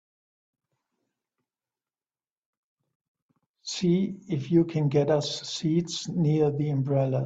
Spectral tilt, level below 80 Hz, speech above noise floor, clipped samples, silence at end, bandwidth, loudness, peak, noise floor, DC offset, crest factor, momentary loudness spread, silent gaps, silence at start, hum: -6.5 dB/octave; -66 dBFS; over 65 dB; under 0.1%; 0 s; 8 kHz; -26 LUFS; -10 dBFS; under -90 dBFS; under 0.1%; 18 dB; 7 LU; none; 3.65 s; none